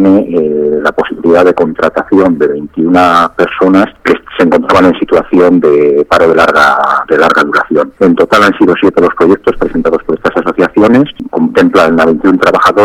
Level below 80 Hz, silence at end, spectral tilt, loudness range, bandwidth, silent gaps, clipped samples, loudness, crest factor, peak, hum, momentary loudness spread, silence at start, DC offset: -38 dBFS; 0 s; -6 dB/octave; 2 LU; 14.5 kHz; none; 0.6%; -8 LUFS; 8 dB; 0 dBFS; none; 6 LU; 0 s; under 0.1%